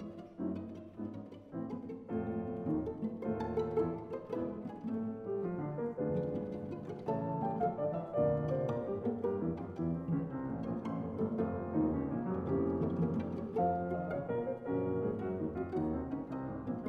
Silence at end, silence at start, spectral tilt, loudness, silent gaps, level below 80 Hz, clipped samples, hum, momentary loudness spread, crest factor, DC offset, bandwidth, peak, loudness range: 0 s; 0 s; -10.5 dB/octave; -37 LUFS; none; -58 dBFS; under 0.1%; none; 8 LU; 16 dB; under 0.1%; 6.4 kHz; -20 dBFS; 3 LU